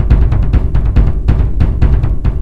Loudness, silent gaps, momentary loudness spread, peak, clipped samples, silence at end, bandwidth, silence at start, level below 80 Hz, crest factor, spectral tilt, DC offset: -13 LUFS; none; 2 LU; 0 dBFS; 1%; 0 s; 4.6 kHz; 0 s; -12 dBFS; 10 dB; -9.5 dB/octave; 8%